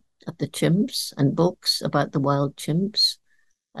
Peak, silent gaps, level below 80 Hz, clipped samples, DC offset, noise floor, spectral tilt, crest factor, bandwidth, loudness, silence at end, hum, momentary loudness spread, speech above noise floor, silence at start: -6 dBFS; none; -60 dBFS; under 0.1%; 0.1%; -66 dBFS; -5 dB/octave; 18 dB; 12.5 kHz; -23 LUFS; 0 s; none; 12 LU; 44 dB; 0.25 s